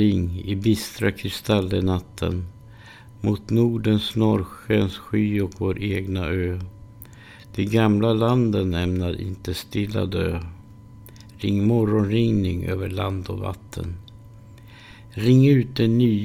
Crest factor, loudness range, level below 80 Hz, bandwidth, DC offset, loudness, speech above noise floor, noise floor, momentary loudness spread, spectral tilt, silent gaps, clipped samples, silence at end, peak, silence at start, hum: 18 dB; 3 LU; -44 dBFS; 16.5 kHz; under 0.1%; -23 LUFS; 23 dB; -44 dBFS; 14 LU; -7.5 dB/octave; none; under 0.1%; 0 s; -6 dBFS; 0 s; none